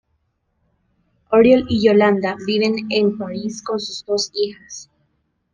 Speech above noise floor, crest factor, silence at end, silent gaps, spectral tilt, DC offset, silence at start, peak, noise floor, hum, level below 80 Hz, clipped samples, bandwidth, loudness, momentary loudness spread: 51 dB; 18 dB; 0.7 s; none; -5 dB/octave; under 0.1%; 1.3 s; -2 dBFS; -68 dBFS; none; -54 dBFS; under 0.1%; 9.6 kHz; -18 LUFS; 13 LU